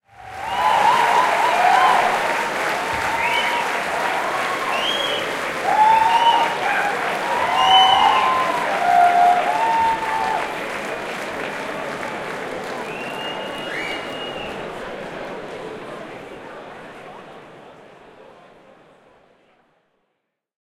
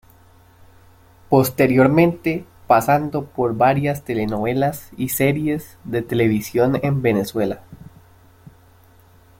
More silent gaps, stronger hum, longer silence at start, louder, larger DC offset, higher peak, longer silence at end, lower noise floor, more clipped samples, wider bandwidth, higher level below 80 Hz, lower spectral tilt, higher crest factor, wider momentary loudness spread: neither; neither; second, 0.2 s vs 1.3 s; about the same, -19 LUFS vs -19 LUFS; neither; about the same, 0 dBFS vs -2 dBFS; first, 2.45 s vs 1.65 s; first, -75 dBFS vs -50 dBFS; neither; about the same, 16.5 kHz vs 17 kHz; second, -56 dBFS vs -50 dBFS; second, -2 dB/octave vs -6.5 dB/octave; about the same, 20 dB vs 18 dB; first, 18 LU vs 10 LU